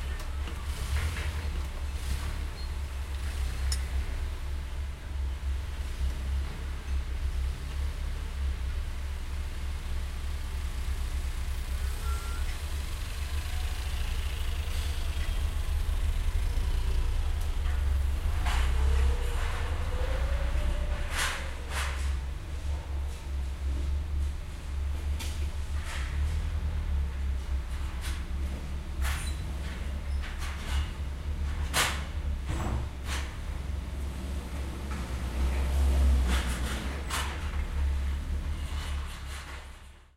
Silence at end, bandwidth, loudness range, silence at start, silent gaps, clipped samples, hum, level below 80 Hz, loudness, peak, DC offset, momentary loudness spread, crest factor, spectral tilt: 0.15 s; 15.5 kHz; 5 LU; 0 s; none; under 0.1%; none; -30 dBFS; -34 LUFS; -12 dBFS; under 0.1%; 7 LU; 18 dB; -4.5 dB/octave